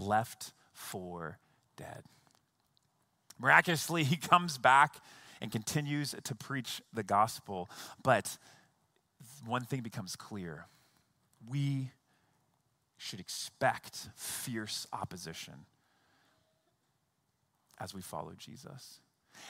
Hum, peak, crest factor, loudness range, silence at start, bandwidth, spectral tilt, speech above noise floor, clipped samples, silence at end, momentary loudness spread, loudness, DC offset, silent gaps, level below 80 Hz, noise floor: none; -8 dBFS; 28 dB; 19 LU; 0 s; 16 kHz; -4 dB/octave; 45 dB; under 0.1%; 0 s; 23 LU; -33 LUFS; under 0.1%; none; -74 dBFS; -79 dBFS